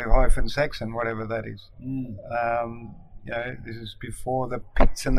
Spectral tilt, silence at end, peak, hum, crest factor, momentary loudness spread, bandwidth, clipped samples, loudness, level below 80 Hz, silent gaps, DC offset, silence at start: -5.5 dB/octave; 0 s; -2 dBFS; none; 20 dB; 13 LU; 11.5 kHz; under 0.1%; -29 LUFS; -28 dBFS; none; under 0.1%; 0 s